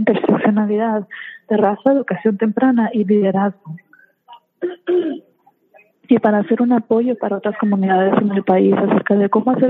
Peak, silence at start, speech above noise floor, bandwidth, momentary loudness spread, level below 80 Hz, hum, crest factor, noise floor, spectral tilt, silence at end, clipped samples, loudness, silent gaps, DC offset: -2 dBFS; 0 s; 37 dB; 3.9 kHz; 11 LU; -66 dBFS; none; 16 dB; -53 dBFS; -10.5 dB/octave; 0 s; under 0.1%; -16 LUFS; none; under 0.1%